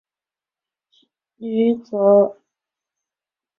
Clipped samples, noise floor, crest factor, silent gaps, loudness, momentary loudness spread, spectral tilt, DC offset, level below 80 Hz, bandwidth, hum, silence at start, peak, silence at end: under 0.1%; under -90 dBFS; 18 dB; none; -18 LUFS; 11 LU; -9.5 dB/octave; under 0.1%; -72 dBFS; 5.6 kHz; none; 1.4 s; -4 dBFS; 1.25 s